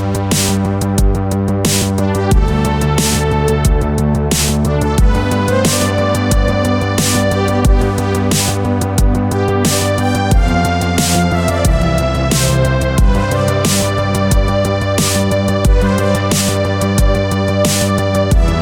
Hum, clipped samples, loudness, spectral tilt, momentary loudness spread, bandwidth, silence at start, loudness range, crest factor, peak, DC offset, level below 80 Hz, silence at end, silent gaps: none; under 0.1%; -14 LUFS; -5 dB/octave; 2 LU; 18 kHz; 0 s; 1 LU; 12 dB; 0 dBFS; under 0.1%; -18 dBFS; 0 s; none